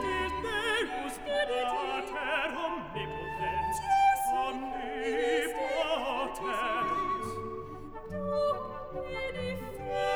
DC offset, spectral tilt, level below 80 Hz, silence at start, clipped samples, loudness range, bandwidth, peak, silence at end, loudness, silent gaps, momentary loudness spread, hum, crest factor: under 0.1%; -4 dB/octave; -52 dBFS; 0 s; under 0.1%; 4 LU; over 20 kHz; -16 dBFS; 0 s; -32 LUFS; none; 9 LU; none; 16 dB